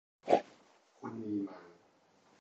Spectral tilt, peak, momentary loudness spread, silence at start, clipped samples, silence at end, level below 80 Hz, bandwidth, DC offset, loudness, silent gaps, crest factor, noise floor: -6.5 dB/octave; -12 dBFS; 21 LU; 0.25 s; under 0.1%; 0.7 s; -82 dBFS; 8.4 kHz; under 0.1%; -36 LUFS; none; 28 dB; -68 dBFS